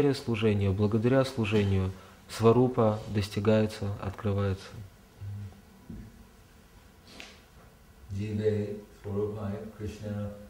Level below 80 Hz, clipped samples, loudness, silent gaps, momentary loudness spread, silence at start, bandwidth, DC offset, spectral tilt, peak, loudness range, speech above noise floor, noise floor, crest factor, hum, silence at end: -56 dBFS; under 0.1%; -29 LUFS; none; 22 LU; 0 s; 16 kHz; under 0.1%; -7.5 dB/octave; -10 dBFS; 18 LU; 27 dB; -55 dBFS; 20 dB; none; 0 s